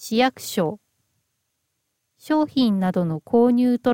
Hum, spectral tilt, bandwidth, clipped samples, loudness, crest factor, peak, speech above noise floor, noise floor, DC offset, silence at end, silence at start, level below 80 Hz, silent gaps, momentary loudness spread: none; -6 dB/octave; 17 kHz; under 0.1%; -21 LUFS; 16 dB; -6 dBFS; 55 dB; -75 dBFS; under 0.1%; 0 s; 0 s; -62 dBFS; none; 7 LU